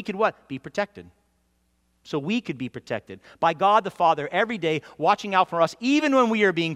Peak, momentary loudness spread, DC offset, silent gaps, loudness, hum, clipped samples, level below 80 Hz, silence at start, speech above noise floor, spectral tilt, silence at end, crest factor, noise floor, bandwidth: -6 dBFS; 13 LU; under 0.1%; none; -23 LUFS; none; under 0.1%; -66 dBFS; 0 s; 45 dB; -5.5 dB/octave; 0 s; 18 dB; -68 dBFS; 13 kHz